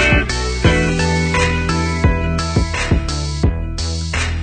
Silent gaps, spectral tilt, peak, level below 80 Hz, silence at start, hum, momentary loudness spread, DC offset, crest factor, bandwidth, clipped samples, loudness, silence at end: none; -5 dB/octave; -2 dBFS; -22 dBFS; 0 s; none; 6 LU; under 0.1%; 14 dB; 9.4 kHz; under 0.1%; -17 LUFS; 0 s